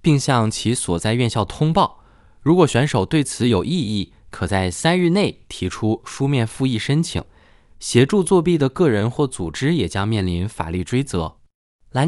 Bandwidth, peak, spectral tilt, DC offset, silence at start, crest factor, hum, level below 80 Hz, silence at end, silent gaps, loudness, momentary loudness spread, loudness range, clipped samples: 12 kHz; 0 dBFS; -5.5 dB/octave; under 0.1%; 0.05 s; 18 dB; none; -44 dBFS; 0 s; 11.54-11.79 s; -20 LUFS; 9 LU; 2 LU; under 0.1%